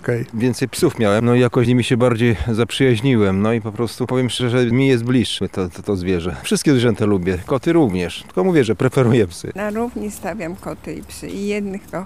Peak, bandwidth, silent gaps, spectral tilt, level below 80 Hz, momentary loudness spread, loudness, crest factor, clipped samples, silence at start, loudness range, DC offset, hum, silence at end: -4 dBFS; 15.5 kHz; none; -6 dB/octave; -42 dBFS; 11 LU; -18 LUFS; 14 dB; under 0.1%; 0.05 s; 4 LU; 0.5%; none; 0 s